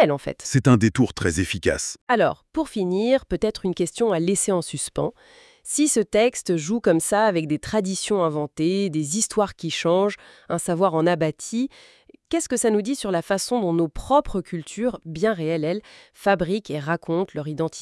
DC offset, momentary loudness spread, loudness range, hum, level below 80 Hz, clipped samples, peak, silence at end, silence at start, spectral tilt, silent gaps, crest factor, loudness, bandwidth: under 0.1%; 8 LU; 3 LU; none; -48 dBFS; under 0.1%; -4 dBFS; 0 s; 0 s; -5 dB/octave; 2.01-2.07 s; 18 dB; -23 LUFS; 12 kHz